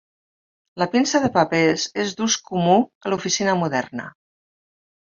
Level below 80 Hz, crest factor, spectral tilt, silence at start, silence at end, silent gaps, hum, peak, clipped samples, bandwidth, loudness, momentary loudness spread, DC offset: -60 dBFS; 20 dB; -4 dB/octave; 0.75 s; 1.05 s; 2.95-3.01 s; none; -2 dBFS; under 0.1%; 7.6 kHz; -20 LUFS; 8 LU; under 0.1%